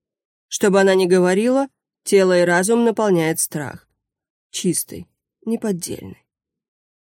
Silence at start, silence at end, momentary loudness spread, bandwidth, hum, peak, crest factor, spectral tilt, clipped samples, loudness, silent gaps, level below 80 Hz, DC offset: 0.5 s; 0.95 s; 16 LU; 17 kHz; none; -4 dBFS; 16 dB; -4.5 dB/octave; under 0.1%; -18 LUFS; 4.30-4.50 s; -62 dBFS; under 0.1%